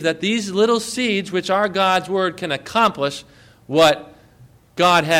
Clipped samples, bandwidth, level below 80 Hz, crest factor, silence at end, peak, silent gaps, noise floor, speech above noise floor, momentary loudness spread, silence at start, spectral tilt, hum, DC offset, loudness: under 0.1%; 16.5 kHz; -56 dBFS; 16 dB; 0 s; -4 dBFS; none; -49 dBFS; 31 dB; 10 LU; 0 s; -4 dB/octave; none; under 0.1%; -19 LUFS